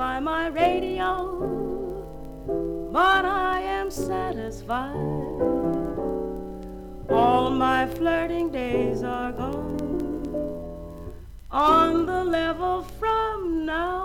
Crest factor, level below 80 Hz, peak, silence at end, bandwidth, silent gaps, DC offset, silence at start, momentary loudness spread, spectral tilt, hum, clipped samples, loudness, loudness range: 18 dB; -42 dBFS; -8 dBFS; 0 s; 18 kHz; none; under 0.1%; 0 s; 16 LU; -6 dB/octave; none; under 0.1%; -25 LUFS; 4 LU